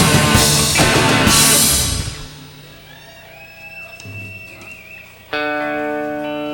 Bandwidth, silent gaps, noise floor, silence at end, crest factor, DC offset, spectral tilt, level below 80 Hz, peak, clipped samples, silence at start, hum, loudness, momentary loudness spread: 19.5 kHz; none; -39 dBFS; 0 s; 18 dB; under 0.1%; -2.5 dB/octave; -34 dBFS; 0 dBFS; under 0.1%; 0 s; 60 Hz at -50 dBFS; -13 LUFS; 24 LU